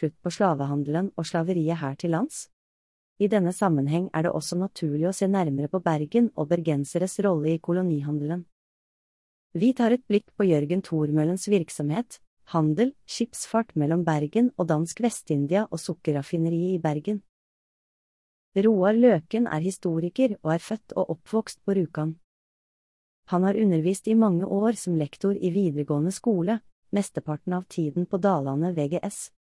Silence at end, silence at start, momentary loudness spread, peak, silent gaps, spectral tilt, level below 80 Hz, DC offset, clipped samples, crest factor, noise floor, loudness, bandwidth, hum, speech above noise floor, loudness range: 0.2 s; 0 s; 8 LU; -8 dBFS; 2.53-3.16 s, 8.52-9.50 s, 12.27-12.37 s, 17.29-18.52 s, 22.24-23.23 s, 26.72-26.82 s; -7 dB/octave; -68 dBFS; under 0.1%; under 0.1%; 18 dB; under -90 dBFS; -26 LUFS; 12 kHz; none; over 65 dB; 3 LU